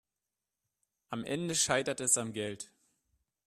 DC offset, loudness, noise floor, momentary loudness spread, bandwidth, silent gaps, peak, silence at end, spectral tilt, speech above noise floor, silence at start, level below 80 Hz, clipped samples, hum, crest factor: under 0.1%; -31 LUFS; -90 dBFS; 15 LU; 13.5 kHz; none; -12 dBFS; 0.8 s; -2.5 dB/octave; 57 dB; 1.1 s; -70 dBFS; under 0.1%; none; 24 dB